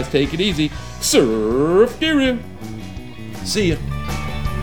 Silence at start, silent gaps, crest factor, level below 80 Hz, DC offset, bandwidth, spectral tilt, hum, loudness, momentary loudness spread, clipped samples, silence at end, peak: 0 s; none; 18 dB; -34 dBFS; 1%; over 20 kHz; -4.5 dB/octave; none; -18 LUFS; 17 LU; under 0.1%; 0 s; -2 dBFS